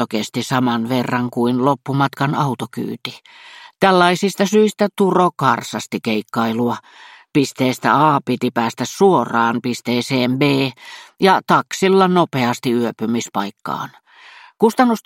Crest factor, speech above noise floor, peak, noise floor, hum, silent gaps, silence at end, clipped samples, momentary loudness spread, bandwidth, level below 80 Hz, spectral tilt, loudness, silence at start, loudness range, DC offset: 18 dB; 26 dB; 0 dBFS; -44 dBFS; none; none; 0.05 s; under 0.1%; 11 LU; 16.5 kHz; -64 dBFS; -5.5 dB/octave; -17 LUFS; 0 s; 2 LU; under 0.1%